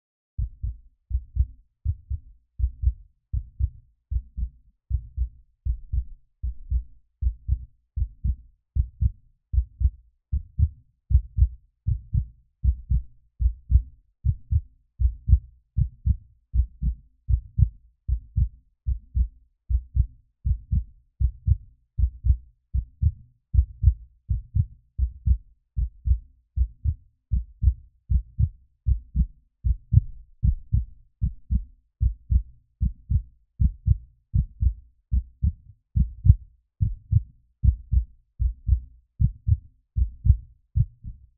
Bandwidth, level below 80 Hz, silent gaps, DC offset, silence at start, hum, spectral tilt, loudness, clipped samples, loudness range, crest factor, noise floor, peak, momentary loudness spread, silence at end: 0.3 kHz; -28 dBFS; none; under 0.1%; 0.4 s; none; -29 dB/octave; -28 LUFS; under 0.1%; 6 LU; 24 dB; -42 dBFS; 0 dBFS; 11 LU; 0.25 s